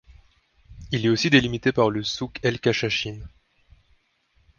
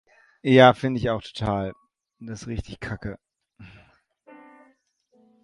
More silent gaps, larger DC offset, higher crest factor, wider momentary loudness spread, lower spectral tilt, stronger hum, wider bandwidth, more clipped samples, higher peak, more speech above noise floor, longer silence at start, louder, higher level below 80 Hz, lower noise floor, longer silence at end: neither; neither; about the same, 22 dB vs 24 dB; second, 11 LU vs 23 LU; second, -5 dB/octave vs -6.5 dB/octave; neither; second, 7.2 kHz vs 11 kHz; neither; second, -4 dBFS vs 0 dBFS; about the same, 43 dB vs 43 dB; first, 0.7 s vs 0.45 s; about the same, -23 LUFS vs -22 LUFS; about the same, -50 dBFS vs -48 dBFS; about the same, -65 dBFS vs -65 dBFS; second, 1.3 s vs 1.75 s